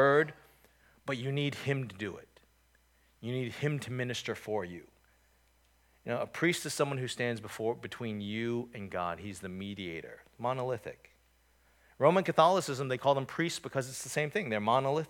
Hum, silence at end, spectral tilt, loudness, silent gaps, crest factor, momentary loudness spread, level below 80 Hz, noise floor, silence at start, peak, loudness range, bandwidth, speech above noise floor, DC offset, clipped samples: none; 0 s; -5 dB/octave; -33 LUFS; none; 24 dB; 14 LU; -70 dBFS; -68 dBFS; 0 s; -10 dBFS; 8 LU; 18 kHz; 36 dB; under 0.1%; under 0.1%